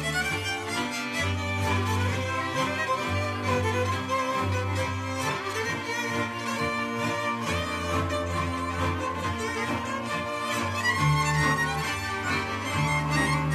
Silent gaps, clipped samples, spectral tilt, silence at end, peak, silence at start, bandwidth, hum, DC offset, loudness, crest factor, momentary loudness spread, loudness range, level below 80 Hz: none; under 0.1%; -4.5 dB/octave; 0 s; -12 dBFS; 0 s; 15 kHz; none; under 0.1%; -27 LUFS; 16 dB; 5 LU; 2 LU; -48 dBFS